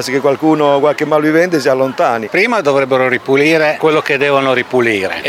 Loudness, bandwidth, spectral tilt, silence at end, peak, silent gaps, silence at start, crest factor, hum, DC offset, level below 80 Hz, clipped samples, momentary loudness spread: -12 LUFS; 16 kHz; -5 dB/octave; 0 s; 0 dBFS; none; 0 s; 12 dB; none; under 0.1%; -60 dBFS; under 0.1%; 2 LU